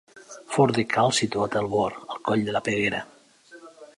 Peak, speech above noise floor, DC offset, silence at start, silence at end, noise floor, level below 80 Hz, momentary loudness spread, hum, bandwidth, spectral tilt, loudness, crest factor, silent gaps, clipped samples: -8 dBFS; 27 dB; under 0.1%; 0.15 s; 0.15 s; -51 dBFS; -60 dBFS; 12 LU; none; 11.5 kHz; -4.5 dB/octave; -24 LUFS; 18 dB; none; under 0.1%